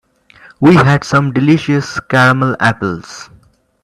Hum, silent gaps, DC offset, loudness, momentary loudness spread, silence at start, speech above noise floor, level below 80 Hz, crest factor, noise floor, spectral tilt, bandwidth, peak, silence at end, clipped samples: none; none; under 0.1%; -12 LUFS; 13 LU; 0.6 s; 36 dB; -46 dBFS; 12 dB; -48 dBFS; -6.5 dB/octave; 12 kHz; 0 dBFS; 0.6 s; under 0.1%